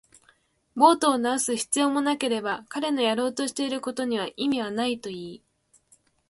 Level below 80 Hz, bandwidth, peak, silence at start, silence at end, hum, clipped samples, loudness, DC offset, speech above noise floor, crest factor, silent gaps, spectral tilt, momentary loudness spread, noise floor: -70 dBFS; 12 kHz; -6 dBFS; 0.75 s; 0.95 s; none; under 0.1%; -25 LUFS; under 0.1%; 39 dB; 20 dB; none; -2.5 dB/octave; 11 LU; -64 dBFS